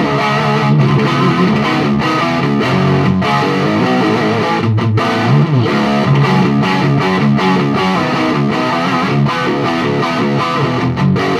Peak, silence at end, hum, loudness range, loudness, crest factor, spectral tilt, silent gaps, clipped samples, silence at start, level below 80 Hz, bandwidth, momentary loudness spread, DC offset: -2 dBFS; 0 s; none; 2 LU; -13 LUFS; 10 dB; -7 dB/octave; none; under 0.1%; 0 s; -44 dBFS; 12 kHz; 3 LU; under 0.1%